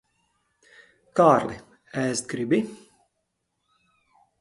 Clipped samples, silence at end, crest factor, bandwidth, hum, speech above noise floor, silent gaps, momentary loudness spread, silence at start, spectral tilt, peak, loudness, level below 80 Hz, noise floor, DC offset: under 0.1%; 1.65 s; 24 dB; 11.5 kHz; none; 55 dB; none; 17 LU; 1.15 s; -5.5 dB/octave; -4 dBFS; -24 LUFS; -64 dBFS; -78 dBFS; under 0.1%